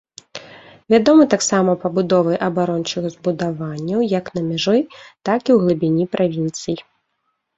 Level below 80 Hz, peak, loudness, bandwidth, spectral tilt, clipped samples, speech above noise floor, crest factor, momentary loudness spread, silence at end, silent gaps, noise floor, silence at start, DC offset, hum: -58 dBFS; 0 dBFS; -18 LUFS; 8 kHz; -5.5 dB/octave; under 0.1%; 54 dB; 18 dB; 14 LU; 0.75 s; none; -71 dBFS; 0.35 s; under 0.1%; none